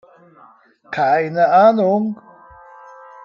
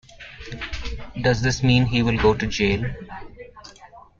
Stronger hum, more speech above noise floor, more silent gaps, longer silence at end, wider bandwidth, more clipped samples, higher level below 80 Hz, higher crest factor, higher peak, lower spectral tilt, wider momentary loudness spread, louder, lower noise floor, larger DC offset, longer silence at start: neither; first, 32 dB vs 27 dB; neither; first, 1.1 s vs 0.2 s; second, 6.8 kHz vs 7.6 kHz; neither; second, -64 dBFS vs -36 dBFS; about the same, 16 dB vs 18 dB; about the same, -2 dBFS vs -4 dBFS; first, -8 dB/octave vs -6 dB/octave; second, 15 LU vs 22 LU; first, -15 LUFS vs -21 LUFS; about the same, -47 dBFS vs -47 dBFS; neither; first, 0.9 s vs 0.1 s